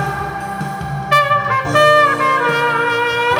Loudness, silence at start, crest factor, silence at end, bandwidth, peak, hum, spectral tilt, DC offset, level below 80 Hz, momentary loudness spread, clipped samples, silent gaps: -14 LUFS; 0 s; 14 dB; 0 s; over 20 kHz; 0 dBFS; none; -4.5 dB/octave; under 0.1%; -44 dBFS; 13 LU; under 0.1%; none